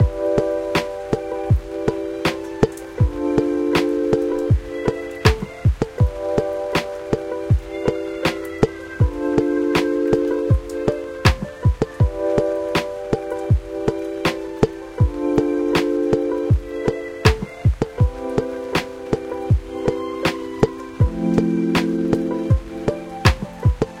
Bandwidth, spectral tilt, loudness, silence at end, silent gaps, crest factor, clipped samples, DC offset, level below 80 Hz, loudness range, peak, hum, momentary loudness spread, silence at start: 16 kHz; -7 dB/octave; -21 LUFS; 0 s; none; 20 dB; under 0.1%; under 0.1%; -28 dBFS; 2 LU; 0 dBFS; none; 5 LU; 0 s